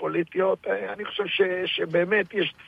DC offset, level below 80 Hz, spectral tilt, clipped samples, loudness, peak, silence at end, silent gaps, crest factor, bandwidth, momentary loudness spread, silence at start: under 0.1%; -70 dBFS; -7 dB/octave; under 0.1%; -25 LUFS; -10 dBFS; 0 s; none; 16 dB; 5.4 kHz; 7 LU; 0 s